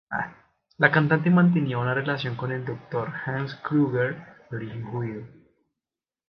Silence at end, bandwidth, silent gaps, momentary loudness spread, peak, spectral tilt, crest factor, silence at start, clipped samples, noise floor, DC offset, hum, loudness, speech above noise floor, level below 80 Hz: 1 s; 5.6 kHz; none; 15 LU; -2 dBFS; -9.5 dB/octave; 24 dB; 0.1 s; under 0.1%; under -90 dBFS; under 0.1%; none; -25 LUFS; over 66 dB; -64 dBFS